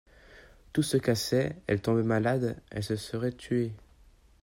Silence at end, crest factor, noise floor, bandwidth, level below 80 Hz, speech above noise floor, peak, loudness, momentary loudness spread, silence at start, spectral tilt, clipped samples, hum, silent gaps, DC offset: 0.65 s; 18 dB; -59 dBFS; 16 kHz; -56 dBFS; 30 dB; -12 dBFS; -30 LUFS; 7 LU; 0.3 s; -6 dB/octave; under 0.1%; none; none; under 0.1%